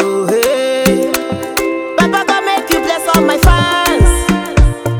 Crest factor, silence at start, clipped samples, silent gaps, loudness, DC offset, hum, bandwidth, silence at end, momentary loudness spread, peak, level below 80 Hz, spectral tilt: 12 dB; 0 s; 0.1%; none; -12 LUFS; under 0.1%; none; over 20 kHz; 0 s; 6 LU; 0 dBFS; -18 dBFS; -4.5 dB/octave